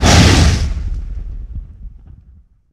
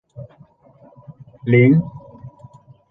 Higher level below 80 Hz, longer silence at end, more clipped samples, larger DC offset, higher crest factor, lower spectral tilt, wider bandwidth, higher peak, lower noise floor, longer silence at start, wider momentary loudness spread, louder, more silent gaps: first, -20 dBFS vs -56 dBFS; first, 0.85 s vs 0.65 s; neither; neither; about the same, 14 dB vs 18 dB; second, -4.5 dB/octave vs -11 dB/octave; first, 14.5 kHz vs 3.9 kHz; about the same, 0 dBFS vs -2 dBFS; second, -46 dBFS vs -50 dBFS; second, 0 s vs 0.2 s; second, 23 LU vs 28 LU; first, -13 LUFS vs -16 LUFS; neither